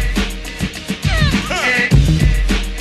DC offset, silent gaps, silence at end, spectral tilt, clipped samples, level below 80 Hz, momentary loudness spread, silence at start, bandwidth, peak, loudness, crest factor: under 0.1%; none; 0 s; -5 dB/octave; under 0.1%; -20 dBFS; 11 LU; 0 s; 13 kHz; -2 dBFS; -16 LUFS; 14 dB